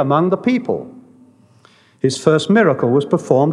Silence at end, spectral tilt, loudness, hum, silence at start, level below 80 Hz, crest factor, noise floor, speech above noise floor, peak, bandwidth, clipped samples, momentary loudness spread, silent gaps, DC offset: 0 s; -6.5 dB/octave; -16 LUFS; none; 0 s; -70 dBFS; 16 dB; -51 dBFS; 36 dB; 0 dBFS; 11.5 kHz; under 0.1%; 10 LU; none; under 0.1%